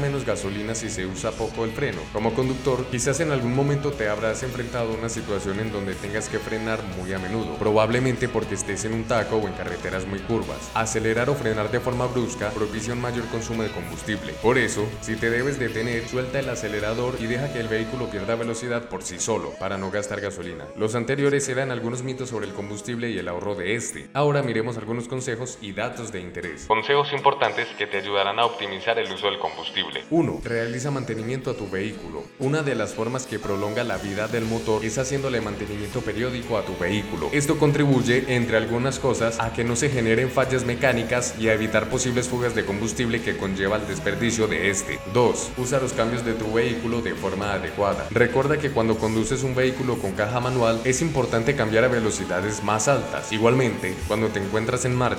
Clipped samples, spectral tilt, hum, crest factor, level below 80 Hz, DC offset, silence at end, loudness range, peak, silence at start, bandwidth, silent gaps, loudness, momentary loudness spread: under 0.1%; -5 dB/octave; none; 22 dB; -44 dBFS; under 0.1%; 0 s; 4 LU; -2 dBFS; 0 s; 17 kHz; none; -24 LUFS; 8 LU